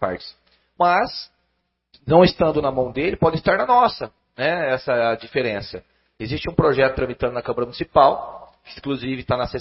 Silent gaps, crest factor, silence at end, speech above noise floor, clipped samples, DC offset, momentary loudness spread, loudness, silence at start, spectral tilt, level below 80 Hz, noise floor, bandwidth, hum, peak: none; 20 dB; 0 s; 52 dB; under 0.1%; under 0.1%; 18 LU; -20 LUFS; 0 s; -10 dB/octave; -44 dBFS; -72 dBFS; 5.8 kHz; none; 0 dBFS